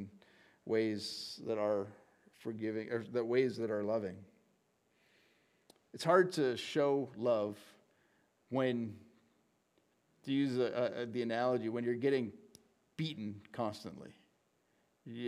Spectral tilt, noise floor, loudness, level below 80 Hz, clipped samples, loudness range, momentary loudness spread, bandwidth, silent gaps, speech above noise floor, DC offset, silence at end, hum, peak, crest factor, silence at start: -6 dB/octave; -76 dBFS; -36 LUFS; -84 dBFS; under 0.1%; 5 LU; 17 LU; 14.5 kHz; none; 41 dB; under 0.1%; 0 s; none; -14 dBFS; 24 dB; 0 s